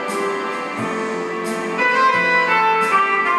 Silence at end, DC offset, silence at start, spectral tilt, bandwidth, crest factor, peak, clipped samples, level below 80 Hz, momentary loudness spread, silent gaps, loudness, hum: 0 s; under 0.1%; 0 s; -3.5 dB/octave; 14 kHz; 14 dB; -6 dBFS; under 0.1%; -70 dBFS; 9 LU; none; -17 LUFS; none